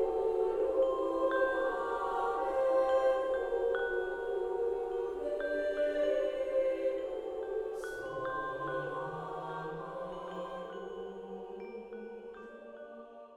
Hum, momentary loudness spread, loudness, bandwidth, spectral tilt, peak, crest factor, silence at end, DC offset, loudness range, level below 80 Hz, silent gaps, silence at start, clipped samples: none; 15 LU; -34 LUFS; 11 kHz; -6 dB/octave; -18 dBFS; 16 dB; 0 s; under 0.1%; 11 LU; -60 dBFS; none; 0 s; under 0.1%